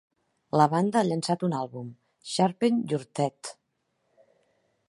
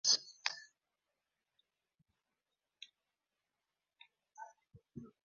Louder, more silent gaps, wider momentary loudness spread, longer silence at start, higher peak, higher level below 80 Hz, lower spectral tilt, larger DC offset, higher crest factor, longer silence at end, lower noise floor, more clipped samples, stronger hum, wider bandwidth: first, -27 LUFS vs -37 LUFS; neither; second, 19 LU vs 25 LU; first, 0.55 s vs 0.05 s; first, -6 dBFS vs -16 dBFS; first, -74 dBFS vs -84 dBFS; first, -6 dB/octave vs 1 dB/octave; neither; second, 22 dB vs 30 dB; first, 1.35 s vs 0.2 s; second, -76 dBFS vs under -90 dBFS; neither; neither; first, 11.5 kHz vs 7.4 kHz